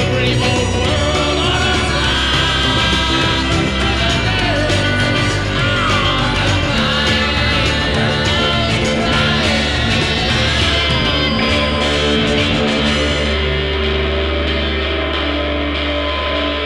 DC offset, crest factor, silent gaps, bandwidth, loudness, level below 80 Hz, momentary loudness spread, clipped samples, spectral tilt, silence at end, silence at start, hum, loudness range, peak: 0.5%; 14 dB; none; 12 kHz; -15 LUFS; -24 dBFS; 4 LU; under 0.1%; -4.5 dB/octave; 0 s; 0 s; none; 2 LU; -2 dBFS